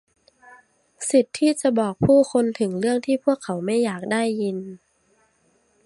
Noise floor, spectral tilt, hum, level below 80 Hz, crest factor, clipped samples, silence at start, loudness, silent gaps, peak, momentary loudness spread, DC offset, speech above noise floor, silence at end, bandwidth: -64 dBFS; -5.5 dB/octave; none; -56 dBFS; 18 dB; under 0.1%; 1 s; -21 LUFS; none; -6 dBFS; 9 LU; under 0.1%; 43 dB; 1.1 s; 11.5 kHz